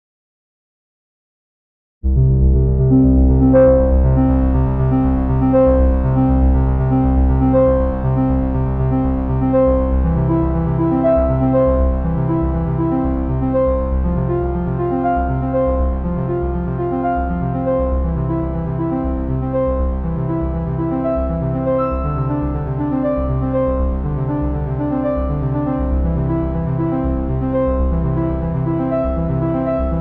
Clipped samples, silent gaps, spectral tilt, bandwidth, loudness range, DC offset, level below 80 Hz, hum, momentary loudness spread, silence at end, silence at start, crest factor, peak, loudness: under 0.1%; none; -13 dB/octave; 3.3 kHz; 6 LU; under 0.1%; -20 dBFS; none; 7 LU; 0 s; 2.05 s; 12 dB; -4 dBFS; -17 LUFS